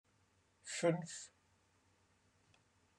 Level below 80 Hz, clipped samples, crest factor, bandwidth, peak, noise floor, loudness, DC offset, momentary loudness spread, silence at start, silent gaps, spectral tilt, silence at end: -86 dBFS; under 0.1%; 24 dB; 11.5 kHz; -22 dBFS; -76 dBFS; -40 LUFS; under 0.1%; 19 LU; 0.65 s; none; -4.5 dB/octave; 1.7 s